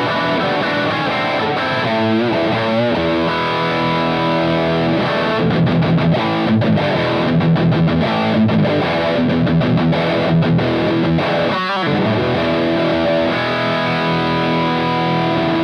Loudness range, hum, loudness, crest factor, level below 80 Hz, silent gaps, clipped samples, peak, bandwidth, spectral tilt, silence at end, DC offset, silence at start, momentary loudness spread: 1 LU; none; -16 LUFS; 10 dB; -46 dBFS; none; under 0.1%; -4 dBFS; 6.8 kHz; -7.5 dB/octave; 0 s; under 0.1%; 0 s; 2 LU